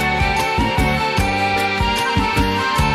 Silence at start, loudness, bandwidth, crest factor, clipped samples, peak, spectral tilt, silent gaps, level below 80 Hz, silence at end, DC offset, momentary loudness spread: 0 s; -17 LUFS; 16 kHz; 14 dB; under 0.1%; -4 dBFS; -4.5 dB/octave; none; -26 dBFS; 0 s; 0.1%; 1 LU